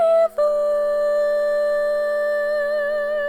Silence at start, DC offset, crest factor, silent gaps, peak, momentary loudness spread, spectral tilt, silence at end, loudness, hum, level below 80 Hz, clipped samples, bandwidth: 0 s; under 0.1%; 10 dB; none; -10 dBFS; 3 LU; -2.5 dB/octave; 0 s; -20 LUFS; none; -54 dBFS; under 0.1%; 14.5 kHz